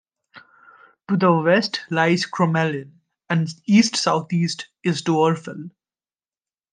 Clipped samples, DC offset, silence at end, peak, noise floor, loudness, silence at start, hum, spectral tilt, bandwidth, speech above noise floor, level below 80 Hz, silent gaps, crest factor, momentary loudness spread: under 0.1%; under 0.1%; 1.05 s; -4 dBFS; under -90 dBFS; -20 LUFS; 0.35 s; none; -5.5 dB/octave; 9.6 kHz; over 70 dB; -70 dBFS; none; 18 dB; 10 LU